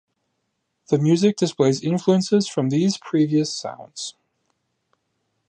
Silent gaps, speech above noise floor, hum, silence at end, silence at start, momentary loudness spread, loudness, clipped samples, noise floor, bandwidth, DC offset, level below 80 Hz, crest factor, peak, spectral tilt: none; 55 dB; none; 1.4 s; 0.9 s; 14 LU; -20 LUFS; under 0.1%; -75 dBFS; 10 kHz; under 0.1%; -68 dBFS; 18 dB; -4 dBFS; -6 dB/octave